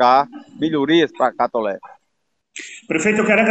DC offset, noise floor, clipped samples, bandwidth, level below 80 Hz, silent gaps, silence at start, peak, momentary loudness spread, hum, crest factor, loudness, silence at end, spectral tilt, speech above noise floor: under 0.1%; -74 dBFS; under 0.1%; 8.8 kHz; -62 dBFS; none; 0 s; -2 dBFS; 18 LU; none; 16 dB; -18 LUFS; 0 s; -4.5 dB/octave; 57 dB